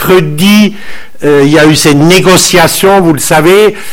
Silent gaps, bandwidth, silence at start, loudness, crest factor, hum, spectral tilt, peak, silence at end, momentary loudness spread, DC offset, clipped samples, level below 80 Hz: none; 19 kHz; 0 s; -5 LUFS; 6 dB; none; -4.5 dB/octave; 0 dBFS; 0 s; 5 LU; under 0.1%; 5%; -34 dBFS